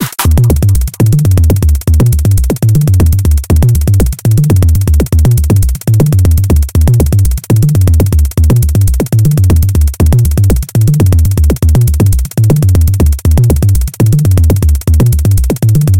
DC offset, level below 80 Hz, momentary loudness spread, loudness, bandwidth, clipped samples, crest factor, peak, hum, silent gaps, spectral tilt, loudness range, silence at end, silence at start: under 0.1%; -12 dBFS; 2 LU; -9 LUFS; 17.5 kHz; 0.1%; 8 dB; 0 dBFS; none; none; -7 dB/octave; 0 LU; 0 s; 0 s